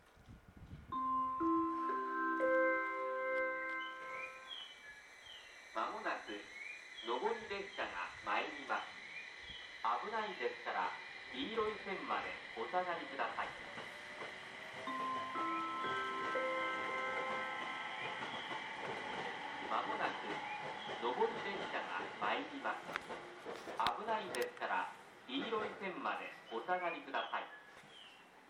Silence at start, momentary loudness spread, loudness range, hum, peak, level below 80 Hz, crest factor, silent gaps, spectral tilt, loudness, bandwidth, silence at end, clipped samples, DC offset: 0 s; 11 LU; 5 LU; none; -18 dBFS; -74 dBFS; 24 dB; none; -3.5 dB/octave; -41 LUFS; 15.5 kHz; 0 s; under 0.1%; under 0.1%